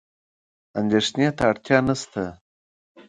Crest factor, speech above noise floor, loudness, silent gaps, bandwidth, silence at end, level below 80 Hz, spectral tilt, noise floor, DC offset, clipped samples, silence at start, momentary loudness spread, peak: 22 dB; over 68 dB; -22 LUFS; 2.41-2.95 s; 10.5 kHz; 0.05 s; -54 dBFS; -5 dB/octave; under -90 dBFS; under 0.1%; under 0.1%; 0.75 s; 11 LU; -2 dBFS